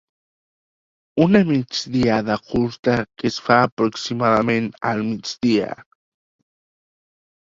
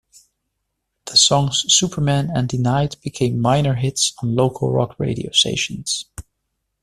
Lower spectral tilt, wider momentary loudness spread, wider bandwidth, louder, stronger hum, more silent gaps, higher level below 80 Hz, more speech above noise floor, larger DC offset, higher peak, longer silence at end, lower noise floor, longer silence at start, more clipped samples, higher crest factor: first, -6 dB/octave vs -4 dB/octave; about the same, 8 LU vs 10 LU; second, 7.6 kHz vs 13.5 kHz; about the same, -20 LUFS vs -18 LUFS; neither; first, 2.79-2.83 s, 3.72-3.77 s vs none; about the same, -52 dBFS vs -48 dBFS; first, over 71 dB vs 57 dB; neither; about the same, 0 dBFS vs -2 dBFS; first, 1.6 s vs 0.6 s; first, under -90 dBFS vs -75 dBFS; about the same, 1.15 s vs 1.05 s; neither; about the same, 20 dB vs 18 dB